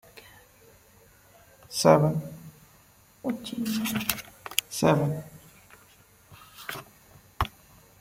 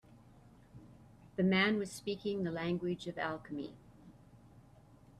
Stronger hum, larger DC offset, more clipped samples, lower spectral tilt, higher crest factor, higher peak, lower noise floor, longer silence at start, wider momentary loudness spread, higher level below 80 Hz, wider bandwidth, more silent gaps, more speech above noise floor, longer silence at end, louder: neither; neither; neither; about the same, -5 dB/octave vs -6 dB/octave; first, 28 dB vs 20 dB; first, -2 dBFS vs -18 dBFS; about the same, -58 dBFS vs -61 dBFS; about the same, 0.15 s vs 0.1 s; first, 26 LU vs 20 LU; first, -52 dBFS vs -68 dBFS; first, 16.5 kHz vs 12.5 kHz; neither; first, 33 dB vs 25 dB; first, 0.5 s vs 0.25 s; first, -27 LUFS vs -36 LUFS